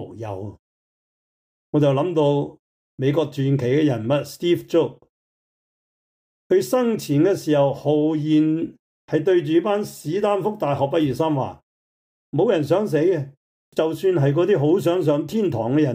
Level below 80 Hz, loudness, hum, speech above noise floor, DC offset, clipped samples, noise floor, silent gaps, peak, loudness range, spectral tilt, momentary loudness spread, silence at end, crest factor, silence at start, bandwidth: -62 dBFS; -21 LUFS; none; over 70 dB; under 0.1%; under 0.1%; under -90 dBFS; 0.59-1.73 s, 2.59-2.98 s, 5.09-6.50 s, 8.79-9.08 s, 11.63-12.32 s, 13.37-13.72 s; -8 dBFS; 3 LU; -7.5 dB/octave; 8 LU; 0 s; 14 dB; 0 s; 16 kHz